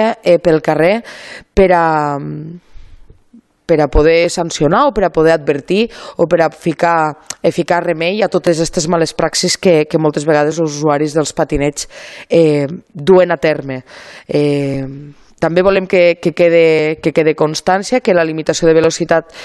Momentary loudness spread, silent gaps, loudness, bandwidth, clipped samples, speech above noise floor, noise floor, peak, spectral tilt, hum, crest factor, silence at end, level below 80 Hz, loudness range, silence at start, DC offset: 10 LU; none; -13 LUFS; 12.5 kHz; under 0.1%; 33 dB; -46 dBFS; 0 dBFS; -5 dB/octave; none; 14 dB; 0 s; -34 dBFS; 3 LU; 0 s; under 0.1%